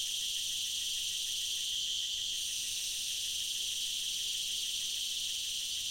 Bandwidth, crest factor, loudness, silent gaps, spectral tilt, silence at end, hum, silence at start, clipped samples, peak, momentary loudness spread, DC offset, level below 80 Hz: 16.5 kHz; 14 dB; -33 LUFS; none; 3 dB/octave; 0 s; none; 0 s; under 0.1%; -22 dBFS; 1 LU; under 0.1%; -66 dBFS